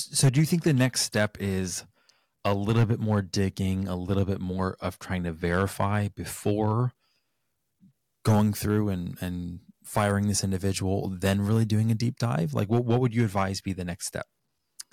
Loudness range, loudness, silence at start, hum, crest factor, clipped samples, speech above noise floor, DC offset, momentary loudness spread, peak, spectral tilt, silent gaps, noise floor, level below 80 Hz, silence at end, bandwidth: 3 LU; -27 LUFS; 0 s; none; 14 dB; under 0.1%; 53 dB; under 0.1%; 10 LU; -12 dBFS; -5.5 dB/octave; none; -79 dBFS; -54 dBFS; 0.1 s; 16.5 kHz